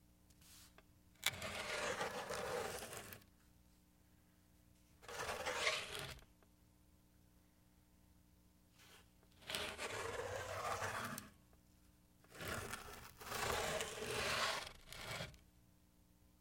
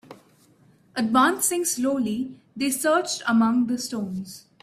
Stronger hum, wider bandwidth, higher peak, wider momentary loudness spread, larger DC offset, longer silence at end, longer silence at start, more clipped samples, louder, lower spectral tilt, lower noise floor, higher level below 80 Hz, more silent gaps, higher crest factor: first, 60 Hz at -75 dBFS vs none; about the same, 16.5 kHz vs 16 kHz; second, -16 dBFS vs -6 dBFS; first, 22 LU vs 13 LU; neither; about the same, 0.15 s vs 0.25 s; first, 0.3 s vs 0.1 s; neither; second, -44 LUFS vs -23 LUFS; second, -2 dB/octave vs -3.5 dB/octave; first, -71 dBFS vs -57 dBFS; about the same, -68 dBFS vs -66 dBFS; neither; first, 32 dB vs 18 dB